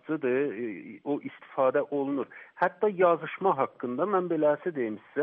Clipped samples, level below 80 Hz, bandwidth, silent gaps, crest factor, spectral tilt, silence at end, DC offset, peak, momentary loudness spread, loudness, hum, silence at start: under 0.1%; -80 dBFS; 4.1 kHz; none; 18 dB; -5.5 dB/octave; 0 s; under 0.1%; -10 dBFS; 10 LU; -28 LUFS; none; 0.05 s